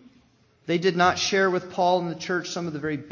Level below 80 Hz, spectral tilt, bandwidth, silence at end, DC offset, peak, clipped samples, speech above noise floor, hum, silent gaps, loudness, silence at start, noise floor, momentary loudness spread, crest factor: -60 dBFS; -4.5 dB/octave; 7.4 kHz; 0 s; under 0.1%; -6 dBFS; under 0.1%; 36 dB; none; none; -24 LUFS; 0.65 s; -60 dBFS; 10 LU; 18 dB